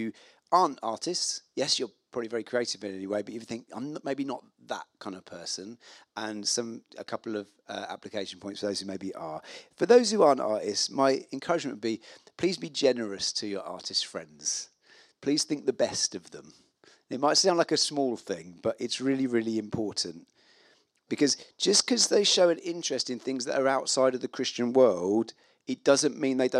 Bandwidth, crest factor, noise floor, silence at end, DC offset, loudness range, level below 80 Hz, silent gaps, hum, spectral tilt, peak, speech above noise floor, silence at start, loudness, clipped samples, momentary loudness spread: 13 kHz; 22 dB; -64 dBFS; 0 s; under 0.1%; 10 LU; -76 dBFS; none; none; -2.5 dB/octave; -6 dBFS; 36 dB; 0 s; -28 LUFS; under 0.1%; 16 LU